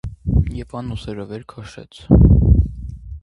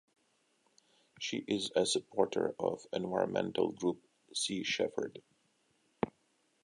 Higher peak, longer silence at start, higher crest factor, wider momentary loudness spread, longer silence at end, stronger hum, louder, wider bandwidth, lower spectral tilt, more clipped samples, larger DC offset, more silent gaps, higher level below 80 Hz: first, 0 dBFS vs -14 dBFS; second, 0.05 s vs 1.2 s; second, 16 dB vs 24 dB; first, 24 LU vs 9 LU; second, 0.05 s vs 0.55 s; neither; first, -16 LUFS vs -35 LUFS; second, 6.4 kHz vs 11.5 kHz; first, -9.5 dB/octave vs -3.5 dB/octave; neither; neither; neither; first, -20 dBFS vs -74 dBFS